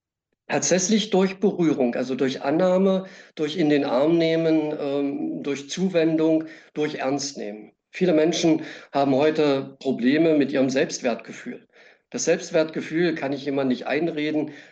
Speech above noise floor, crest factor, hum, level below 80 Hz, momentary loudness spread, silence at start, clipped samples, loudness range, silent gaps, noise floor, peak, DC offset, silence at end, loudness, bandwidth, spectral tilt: 29 dB; 12 dB; none; -72 dBFS; 10 LU; 0.5 s; under 0.1%; 3 LU; none; -51 dBFS; -10 dBFS; under 0.1%; 0.1 s; -23 LUFS; 8.6 kHz; -5 dB/octave